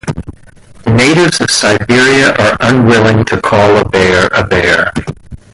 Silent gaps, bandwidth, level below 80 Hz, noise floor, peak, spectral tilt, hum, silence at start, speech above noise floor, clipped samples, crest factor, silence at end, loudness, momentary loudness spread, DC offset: none; 11.5 kHz; -32 dBFS; -36 dBFS; 0 dBFS; -4.5 dB/octave; none; 0.05 s; 27 dB; under 0.1%; 10 dB; 0.15 s; -8 LUFS; 10 LU; under 0.1%